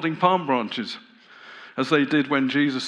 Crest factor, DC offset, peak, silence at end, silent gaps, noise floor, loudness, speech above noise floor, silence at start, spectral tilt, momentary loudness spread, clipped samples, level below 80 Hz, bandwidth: 20 dB; under 0.1%; -4 dBFS; 0 s; none; -46 dBFS; -22 LUFS; 24 dB; 0 s; -5.5 dB/octave; 17 LU; under 0.1%; -86 dBFS; 9.8 kHz